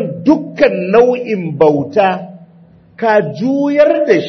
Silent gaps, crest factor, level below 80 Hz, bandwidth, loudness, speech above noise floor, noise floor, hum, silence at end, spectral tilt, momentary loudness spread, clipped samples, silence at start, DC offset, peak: none; 12 dB; -52 dBFS; 6.4 kHz; -13 LUFS; 32 dB; -43 dBFS; none; 0 s; -7.5 dB/octave; 8 LU; under 0.1%; 0 s; under 0.1%; 0 dBFS